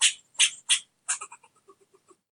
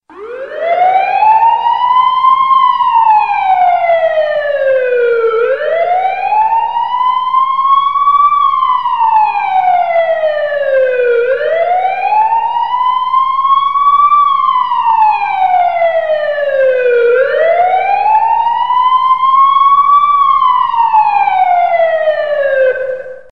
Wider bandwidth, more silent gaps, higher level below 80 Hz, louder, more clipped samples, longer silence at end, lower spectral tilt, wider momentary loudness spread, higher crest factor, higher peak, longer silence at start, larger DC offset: first, 11.5 kHz vs 6 kHz; neither; second, under -90 dBFS vs -54 dBFS; second, -25 LUFS vs -10 LUFS; neither; first, 0.95 s vs 0.1 s; second, 5.5 dB/octave vs -3.5 dB/octave; first, 9 LU vs 5 LU; first, 22 dB vs 10 dB; second, -6 dBFS vs 0 dBFS; about the same, 0 s vs 0.1 s; second, under 0.1% vs 1%